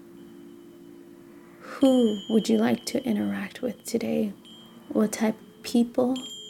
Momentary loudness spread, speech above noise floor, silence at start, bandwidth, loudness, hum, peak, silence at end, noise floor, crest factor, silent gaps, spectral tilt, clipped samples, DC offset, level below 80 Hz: 24 LU; 24 dB; 0.1 s; 16.5 kHz; -26 LUFS; none; -10 dBFS; 0 s; -48 dBFS; 18 dB; none; -5 dB/octave; under 0.1%; under 0.1%; -68 dBFS